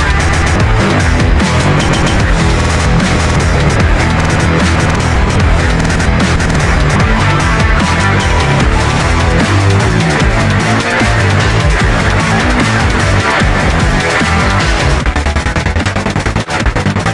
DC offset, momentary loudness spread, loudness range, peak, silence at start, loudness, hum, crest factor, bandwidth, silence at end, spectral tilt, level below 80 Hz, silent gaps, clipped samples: under 0.1%; 3 LU; 1 LU; 0 dBFS; 0 s; -11 LUFS; none; 10 dB; 11.5 kHz; 0 s; -5 dB/octave; -16 dBFS; none; under 0.1%